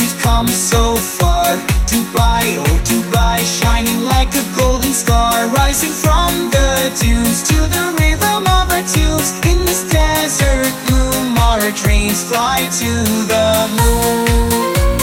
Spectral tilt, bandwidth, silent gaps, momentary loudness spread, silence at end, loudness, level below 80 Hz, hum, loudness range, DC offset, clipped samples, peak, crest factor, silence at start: -4 dB/octave; 17 kHz; none; 2 LU; 0 s; -14 LUFS; -18 dBFS; none; 1 LU; under 0.1%; under 0.1%; -2 dBFS; 12 dB; 0 s